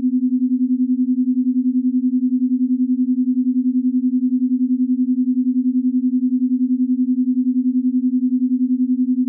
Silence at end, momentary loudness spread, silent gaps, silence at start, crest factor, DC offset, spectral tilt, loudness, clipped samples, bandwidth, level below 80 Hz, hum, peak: 0 s; 0 LU; none; 0 s; 6 dB; under 0.1%; -18 dB/octave; -18 LUFS; under 0.1%; 0.4 kHz; under -90 dBFS; none; -12 dBFS